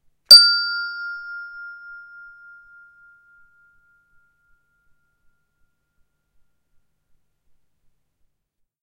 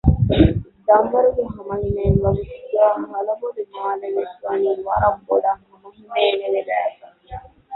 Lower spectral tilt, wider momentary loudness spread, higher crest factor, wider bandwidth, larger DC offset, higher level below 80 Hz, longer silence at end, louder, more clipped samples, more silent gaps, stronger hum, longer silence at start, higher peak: second, 3 dB/octave vs -11.5 dB/octave; first, 29 LU vs 11 LU; first, 24 dB vs 18 dB; first, 16 kHz vs 4.2 kHz; neither; second, -66 dBFS vs -32 dBFS; first, 7.1 s vs 0 s; first, -10 LUFS vs -20 LUFS; neither; neither; neither; first, 0.3 s vs 0.05 s; about the same, 0 dBFS vs -2 dBFS